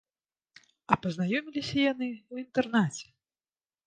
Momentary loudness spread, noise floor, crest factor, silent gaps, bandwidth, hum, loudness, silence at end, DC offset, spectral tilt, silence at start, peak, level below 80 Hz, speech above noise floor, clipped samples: 8 LU; under -90 dBFS; 26 dB; none; 9.8 kHz; none; -30 LUFS; 0.85 s; under 0.1%; -5.5 dB/octave; 0.9 s; -4 dBFS; -66 dBFS; over 61 dB; under 0.1%